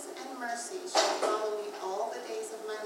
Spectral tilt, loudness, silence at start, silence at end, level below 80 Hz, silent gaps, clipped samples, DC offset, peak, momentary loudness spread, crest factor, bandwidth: -0.5 dB/octave; -33 LUFS; 0 s; 0 s; under -90 dBFS; none; under 0.1%; under 0.1%; -10 dBFS; 10 LU; 22 dB; 16 kHz